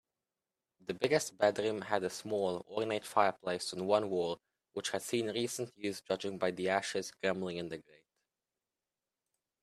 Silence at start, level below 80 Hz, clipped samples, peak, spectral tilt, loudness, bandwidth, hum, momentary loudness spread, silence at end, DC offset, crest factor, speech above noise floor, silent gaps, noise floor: 0.9 s; -78 dBFS; under 0.1%; -14 dBFS; -4 dB/octave; -35 LUFS; 15 kHz; none; 9 LU; 1.8 s; under 0.1%; 24 dB; over 55 dB; none; under -90 dBFS